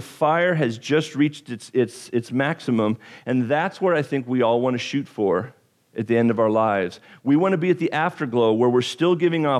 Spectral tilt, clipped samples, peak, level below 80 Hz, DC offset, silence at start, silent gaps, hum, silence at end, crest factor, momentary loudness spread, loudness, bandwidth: -6.5 dB/octave; under 0.1%; -6 dBFS; -66 dBFS; under 0.1%; 0 s; none; none; 0 s; 14 dB; 7 LU; -22 LUFS; 12.5 kHz